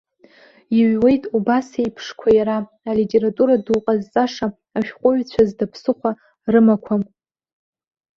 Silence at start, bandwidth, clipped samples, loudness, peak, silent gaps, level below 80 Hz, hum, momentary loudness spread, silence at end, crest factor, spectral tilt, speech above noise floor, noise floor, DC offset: 0.7 s; 7 kHz; under 0.1%; -19 LUFS; -2 dBFS; none; -54 dBFS; none; 10 LU; 1.15 s; 16 dB; -7.5 dB/octave; 33 dB; -50 dBFS; under 0.1%